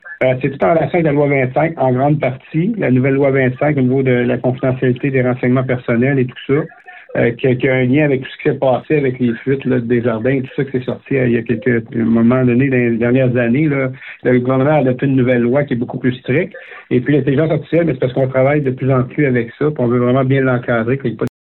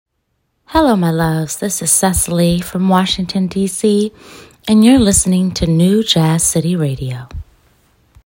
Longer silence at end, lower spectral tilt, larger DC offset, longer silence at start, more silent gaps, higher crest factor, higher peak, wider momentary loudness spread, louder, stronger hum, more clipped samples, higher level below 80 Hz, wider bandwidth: second, 0.2 s vs 0.85 s; first, -11 dB/octave vs -4.5 dB/octave; neither; second, 0.05 s vs 0.7 s; neither; about the same, 12 dB vs 14 dB; second, -4 dBFS vs 0 dBFS; second, 5 LU vs 10 LU; about the same, -15 LUFS vs -13 LUFS; neither; neither; second, -48 dBFS vs -34 dBFS; second, 4.2 kHz vs 16.5 kHz